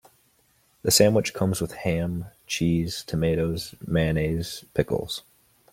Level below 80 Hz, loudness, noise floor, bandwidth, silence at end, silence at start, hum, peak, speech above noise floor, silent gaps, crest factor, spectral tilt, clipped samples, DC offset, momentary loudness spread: -46 dBFS; -25 LUFS; -64 dBFS; 16.5 kHz; 0.55 s; 0.85 s; none; -4 dBFS; 40 dB; none; 22 dB; -4.5 dB/octave; under 0.1%; under 0.1%; 12 LU